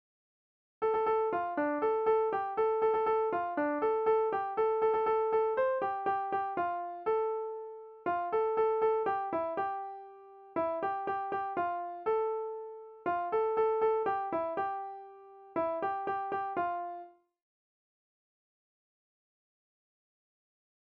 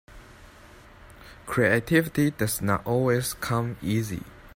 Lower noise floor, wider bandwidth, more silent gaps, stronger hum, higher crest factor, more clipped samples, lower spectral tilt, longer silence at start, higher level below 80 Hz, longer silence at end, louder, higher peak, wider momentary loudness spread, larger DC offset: about the same, -53 dBFS vs -50 dBFS; second, 4.6 kHz vs 16.5 kHz; neither; neither; second, 14 dB vs 20 dB; neither; second, -4 dB/octave vs -5.5 dB/octave; first, 0.8 s vs 0.1 s; second, -72 dBFS vs -50 dBFS; first, 3.9 s vs 0.1 s; second, -32 LUFS vs -25 LUFS; second, -18 dBFS vs -8 dBFS; first, 11 LU vs 8 LU; neither